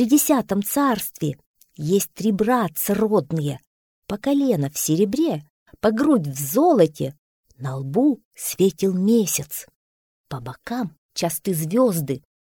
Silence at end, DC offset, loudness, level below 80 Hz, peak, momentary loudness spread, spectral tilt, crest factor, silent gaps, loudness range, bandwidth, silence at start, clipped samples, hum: 0.25 s; under 0.1%; -21 LUFS; -58 dBFS; -4 dBFS; 13 LU; -5.5 dB/octave; 18 dB; 1.46-1.54 s, 3.67-4.02 s, 5.50-5.66 s, 7.19-7.44 s, 8.25-8.31 s, 9.76-10.24 s, 10.98-11.09 s; 3 LU; 20 kHz; 0 s; under 0.1%; none